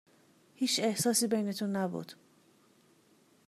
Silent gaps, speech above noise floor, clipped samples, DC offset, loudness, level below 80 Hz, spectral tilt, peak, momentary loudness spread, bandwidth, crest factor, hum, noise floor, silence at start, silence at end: none; 34 dB; under 0.1%; under 0.1%; -31 LUFS; -80 dBFS; -3.5 dB/octave; -14 dBFS; 10 LU; 15 kHz; 20 dB; none; -66 dBFS; 0.6 s; 1.35 s